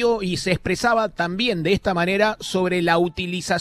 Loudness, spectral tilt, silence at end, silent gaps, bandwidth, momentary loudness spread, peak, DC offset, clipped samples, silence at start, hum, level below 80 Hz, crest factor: -21 LUFS; -5 dB/octave; 0 s; none; 14 kHz; 4 LU; -4 dBFS; under 0.1%; under 0.1%; 0 s; none; -46 dBFS; 16 dB